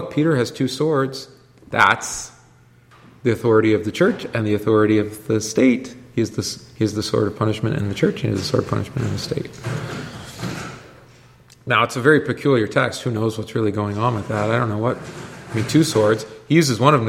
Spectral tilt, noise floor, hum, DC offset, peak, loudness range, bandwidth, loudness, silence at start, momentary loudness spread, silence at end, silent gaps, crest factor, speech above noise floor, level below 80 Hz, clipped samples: -5.5 dB/octave; -51 dBFS; none; under 0.1%; 0 dBFS; 5 LU; 16 kHz; -20 LUFS; 0 s; 13 LU; 0 s; none; 20 dB; 32 dB; -52 dBFS; under 0.1%